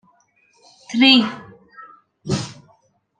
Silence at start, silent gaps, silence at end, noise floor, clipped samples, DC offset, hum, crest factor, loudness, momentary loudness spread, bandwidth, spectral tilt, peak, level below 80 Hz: 0.9 s; none; 0.65 s; -60 dBFS; under 0.1%; under 0.1%; none; 20 dB; -17 LUFS; 24 LU; 9.6 kHz; -4 dB/octave; -2 dBFS; -58 dBFS